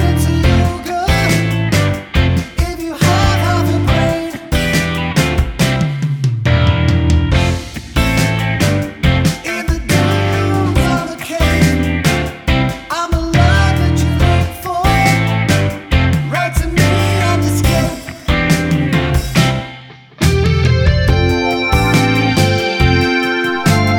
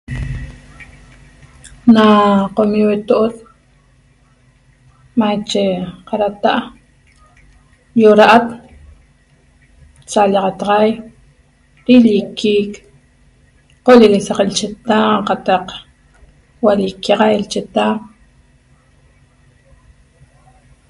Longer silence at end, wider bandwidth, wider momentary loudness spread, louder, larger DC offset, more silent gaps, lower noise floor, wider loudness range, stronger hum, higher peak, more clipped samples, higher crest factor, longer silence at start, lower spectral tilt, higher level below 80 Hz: second, 0 s vs 2.85 s; first, 18.5 kHz vs 11.5 kHz; second, 6 LU vs 17 LU; about the same, -14 LUFS vs -13 LUFS; neither; neither; second, -35 dBFS vs -51 dBFS; second, 2 LU vs 6 LU; neither; about the same, 0 dBFS vs 0 dBFS; second, under 0.1% vs 0.3%; about the same, 14 dB vs 16 dB; about the same, 0 s vs 0.1 s; about the same, -5.5 dB/octave vs -5.5 dB/octave; first, -22 dBFS vs -42 dBFS